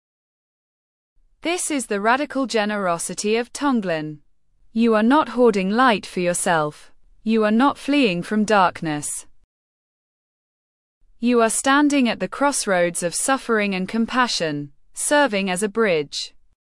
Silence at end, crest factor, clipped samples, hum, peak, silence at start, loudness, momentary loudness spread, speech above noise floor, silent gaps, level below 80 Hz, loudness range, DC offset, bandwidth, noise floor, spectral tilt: 0.35 s; 16 dB; under 0.1%; none; -4 dBFS; 1.45 s; -20 LUFS; 10 LU; 36 dB; 9.44-11.01 s; -56 dBFS; 4 LU; under 0.1%; 12 kHz; -56 dBFS; -3.5 dB/octave